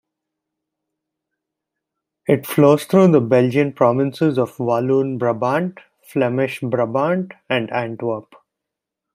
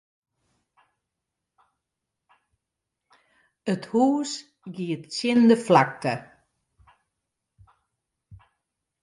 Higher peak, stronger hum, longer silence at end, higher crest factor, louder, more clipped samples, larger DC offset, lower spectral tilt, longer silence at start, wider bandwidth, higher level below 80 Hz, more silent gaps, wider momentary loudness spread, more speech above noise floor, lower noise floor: about the same, -2 dBFS vs -4 dBFS; neither; first, 0.95 s vs 0.7 s; second, 18 dB vs 24 dB; first, -18 LUFS vs -23 LUFS; neither; neither; first, -7.5 dB/octave vs -5.5 dB/octave; second, 2.3 s vs 3.65 s; first, 16 kHz vs 11.5 kHz; about the same, -64 dBFS vs -68 dBFS; neither; second, 11 LU vs 16 LU; first, 66 dB vs 62 dB; about the same, -83 dBFS vs -84 dBFS